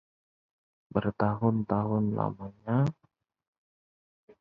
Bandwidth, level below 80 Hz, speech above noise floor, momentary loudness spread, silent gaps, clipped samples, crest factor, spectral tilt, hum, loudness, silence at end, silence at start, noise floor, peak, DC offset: 6.8 kHz; -58 dBFS; over 62 dB; 6 LU; none; under 0.1%; 22 dB; -10 dB/octave; none; -30 LUFS; 1.5 s; 0.95 s; under -90 dBFS; -10 dBFS; under 0.1%